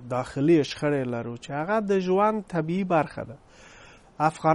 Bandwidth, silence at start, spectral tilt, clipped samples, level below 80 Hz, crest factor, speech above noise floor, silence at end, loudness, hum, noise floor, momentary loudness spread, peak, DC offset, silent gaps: 11.5 kHz; 0 s; -7 dB/octave; under 0.1%; -58 dBFS; 18 dB; 26 dB; 0 s; -25 LUFS; none; -51 dBFS; 11 LU; -6 dBFS; under 0.1%; none